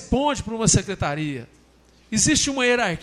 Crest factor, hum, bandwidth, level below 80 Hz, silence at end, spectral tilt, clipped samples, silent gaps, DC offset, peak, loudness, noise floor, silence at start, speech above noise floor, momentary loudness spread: 18 dB; none; 13 kHz; -40 dBFS; 0 s; -3.5 dB/octave; under 0.1%; none; under 0.1%; -4 dBFS; -21 LUFS; -55 dBFS; 0 s; 33 dB; 10 LU